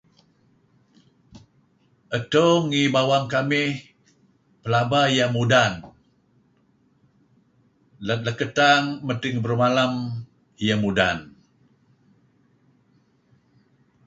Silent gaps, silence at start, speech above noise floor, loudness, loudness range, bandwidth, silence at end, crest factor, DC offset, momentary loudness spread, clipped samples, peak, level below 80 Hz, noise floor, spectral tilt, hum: none; 1.35 s; 42 dB; -21 LUFS; 6 LU; 8 kHz; 2.75 s; 20 dB; under 0.1%; 12 LU; under 0.1%; -4 dBFS; -58 dBFS; -63 dBFS; -5 dB/octave; none